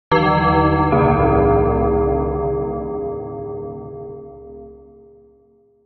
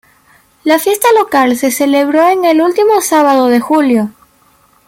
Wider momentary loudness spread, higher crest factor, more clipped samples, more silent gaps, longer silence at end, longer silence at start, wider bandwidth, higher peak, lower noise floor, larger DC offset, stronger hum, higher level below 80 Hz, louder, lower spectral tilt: first, 21 LU vs 4 LU; first, 16 dB vs 10 dB; neither; neither; first, 1.1 s vs 0.8 s; second, 0.1 s vs 0.65 s; second, 6 kHz vs 17 kHz; about the same, -2 dBFS vs 0 dBFS; first, -55 dBFS vs -50 dBFS; neither; neither; first, -30 dBFS vs -56 dBFS; second, -17 LUFS vs -10 LUFS; first, -6.5 dB/octave vs -3.5 dB/octave